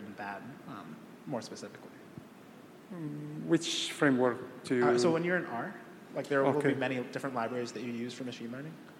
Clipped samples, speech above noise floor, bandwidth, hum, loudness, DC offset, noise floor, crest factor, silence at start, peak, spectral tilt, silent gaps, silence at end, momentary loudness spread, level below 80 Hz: under 0.1%; 20 dB; 16 kHz; none; -33 LUFS; under 0.1%; -53 dBFS; 20 dB; 0 s; -12 dBFS; -5 dB/octave; none; 0 s; 21 LU; -80 dBFS